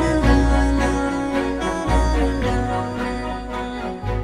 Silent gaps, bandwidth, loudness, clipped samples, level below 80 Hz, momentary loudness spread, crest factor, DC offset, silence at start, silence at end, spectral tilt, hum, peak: none; 10.5 kHz; -21 LUFS; under 0.1%; -24 dBFS; 10 LU; 16 dB; under 0.1%; 0 s; 0 s; -6.5 dB/octave; none; -4 dBFS